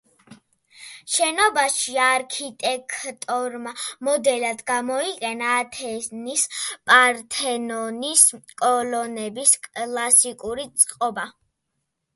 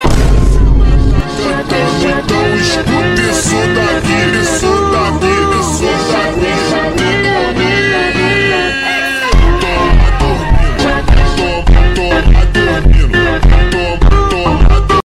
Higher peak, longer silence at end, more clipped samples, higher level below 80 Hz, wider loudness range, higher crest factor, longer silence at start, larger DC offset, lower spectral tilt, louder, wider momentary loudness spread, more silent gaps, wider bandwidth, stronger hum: about the same, 0 dBFS vs 0 dBFS; first, 0.85 s vs 0.05 s; neither; second, -66 dBFS vs -12 dBFS; first, 6 LU vs 1 LU; first, 22 dB vs 10 dB; first, 0.3 s vs 0 s; neither; second, 0 dB/octave vs -5 dB/octave; second, -21 LUFS vs -11 LUFS; first, 15 LU vs 3 LU; neither; about the same, 12 kHz vs 12 kHz; neither